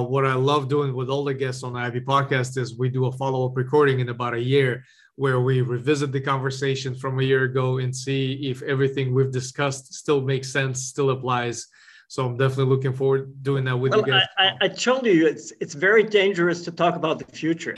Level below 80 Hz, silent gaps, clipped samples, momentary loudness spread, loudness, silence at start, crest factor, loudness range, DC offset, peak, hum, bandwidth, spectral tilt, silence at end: -62 dBFS; none; under 0.1%; 9 LU; -22 LUFS; 0 s; 18 dB; 4 LU; under 0.1%; -4 dBFS; none; 11.5 kHz; -5.5 dB/octave; 0 s